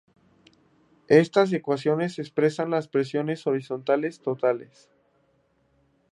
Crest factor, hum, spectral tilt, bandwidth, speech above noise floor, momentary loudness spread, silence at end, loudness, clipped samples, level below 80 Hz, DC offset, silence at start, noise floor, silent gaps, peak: 22 dB; none; -7 dB/octave; 11 kHz; 43 dB; 8 LU; 1.45 s; -25 LUFS; under 0.1%; -74 dBFS; under 0.1%; 1.1 s; -67 dBFS; none; -4 dBFS